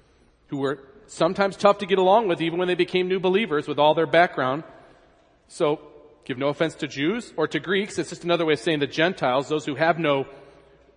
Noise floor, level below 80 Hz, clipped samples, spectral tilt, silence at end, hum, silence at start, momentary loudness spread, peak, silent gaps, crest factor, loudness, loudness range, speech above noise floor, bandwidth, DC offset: -58 dBFS; -64 dBFS; under 0.1%; -5.5 dB/octave; 0.6 s; none; 0.5 s; 10 LU; -2 dBFS; none; 22 dB; -23 LUFS; 6 LU; 36 dB; 10.5 kHz; under 0.1%